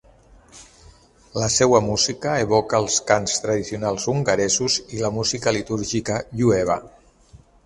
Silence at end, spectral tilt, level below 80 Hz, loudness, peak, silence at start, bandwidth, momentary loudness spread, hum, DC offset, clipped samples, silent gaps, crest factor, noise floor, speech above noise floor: 0.3 s; -3.5 dB/octave; -48 dBFS; -21 LUFS; 0 dBFS; 0.55 s; 11.5 kHz; 7 LU; none; under 0.1%; under 0.1%; none; 22 dB; -51 dBFS; 30 dB